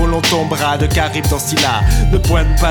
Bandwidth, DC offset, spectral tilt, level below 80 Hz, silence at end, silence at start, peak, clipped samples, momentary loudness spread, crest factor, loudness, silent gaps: 19.5 kHz; under 0.1%; -4.5 dB/octave; -16 dBFS; 0 s; 0 s; -2 dBFS; under 0.1%; 2 LU; 10 dB; -14 LUFS; none